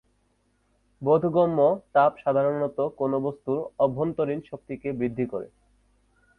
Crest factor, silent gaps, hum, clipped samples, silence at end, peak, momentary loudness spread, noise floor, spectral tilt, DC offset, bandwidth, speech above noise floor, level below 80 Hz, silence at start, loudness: 18 dB; none; 50 Hz at -60 dBFS; under 0.1%; 0.9 s; -8 dBFS; 12 LU; -69 dBFS; -10 dB/octave; under 0.1%; 4.3 kHz; 44 dB; -62 dBFS; 1 s; -25 LUFS